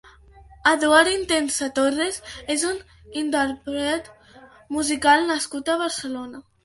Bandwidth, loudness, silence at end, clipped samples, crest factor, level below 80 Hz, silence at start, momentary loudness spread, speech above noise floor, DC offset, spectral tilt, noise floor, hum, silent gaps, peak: 12 kHz; -22 LUFS; 0.25 s; under 0.1%; 20 dB; -54 dBFS; 0.5 s; 15 LU; 27 dB; under 0.1%; -2 dB/octave; -49 dBFS; none; none; -2 dBFS